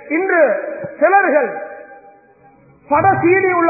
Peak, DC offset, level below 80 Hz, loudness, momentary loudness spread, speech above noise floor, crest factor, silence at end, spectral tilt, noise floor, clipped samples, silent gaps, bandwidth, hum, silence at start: -2 dBFS; under 0.1%; -54 dBFS; -14 LUFS; 16 LU; 34 dB; 14 dB; 0 s; -15 dB/octave; -48 dBFS; under 0.1%; none; 2.7 kHz; none; 0 s